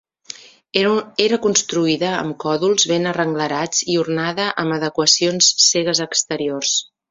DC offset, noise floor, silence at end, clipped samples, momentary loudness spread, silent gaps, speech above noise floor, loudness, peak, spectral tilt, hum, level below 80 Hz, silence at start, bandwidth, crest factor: under 0.1%; -39 dBFS; 0.3 s; under 0.1%; 9 LU; none; 21 dB; -17 LUFS; 0 dBFS; -2.5 dB/octave; none; -62 dBFS; 0.35 s; 7.8 kHz; 18 dB